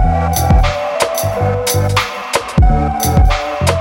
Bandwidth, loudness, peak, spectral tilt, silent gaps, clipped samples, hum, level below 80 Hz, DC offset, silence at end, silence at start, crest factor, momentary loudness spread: 19.5 kHz; -14 LUFS; -2 dBFS; -5 dB/octave; none; under 0.1%; none; -18 dBFS; under 0.1%; 0 s; 0 s; 12 dB; 4 LU